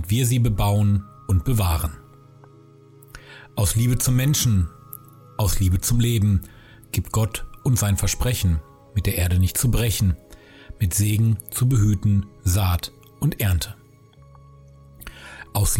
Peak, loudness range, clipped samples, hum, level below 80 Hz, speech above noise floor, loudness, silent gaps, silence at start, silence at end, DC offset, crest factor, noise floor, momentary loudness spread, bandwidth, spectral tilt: -10 dBFS; 4 LU; under 0.1%; none; -34 dBFS; 30 dB; -22 LUFS; none; 0 s; 0 s; under 0.1%; 12 dB; -50 dBFS; 14 LU; 17 kHz; -5 dB/octave